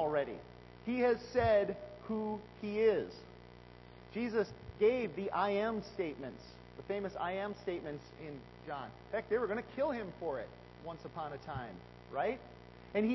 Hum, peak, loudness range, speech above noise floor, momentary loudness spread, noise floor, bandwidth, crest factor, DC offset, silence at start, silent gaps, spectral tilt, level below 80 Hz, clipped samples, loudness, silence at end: 60 Hz at -60 dBFS; -20 dBFS; 6 LU; 19 dB; 20 LU; -55 dBFS; 6 kHz; 18 dB; under 0.1%; 0 s; none; -5 dB/octave; -60 dBFS; under 0.1%; -37 LUFS; 0 s